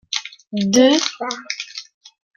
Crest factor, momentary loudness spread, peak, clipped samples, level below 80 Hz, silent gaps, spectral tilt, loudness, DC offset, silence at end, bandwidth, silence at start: 20 dB; 16 LU; 0 dBFS; under 0.1%; -66 dBFS; none; -3.5 dB/octave; -19 LUFS; under 0.1%; 0.55 s; 12.5 kHz; 0.1 s